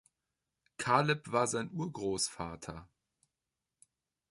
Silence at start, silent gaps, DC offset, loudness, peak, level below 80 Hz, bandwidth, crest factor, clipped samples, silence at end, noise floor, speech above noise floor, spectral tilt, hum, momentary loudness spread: 0.8 s; none; under 0.1%; -33 LUFS; -12 dBFS; -64 dBFS; 11.5 kHz; 26 dB; under 0.1%; 1.45 s; -90 dBFS; 56 dB; -4 dB/octave; none; 17 LU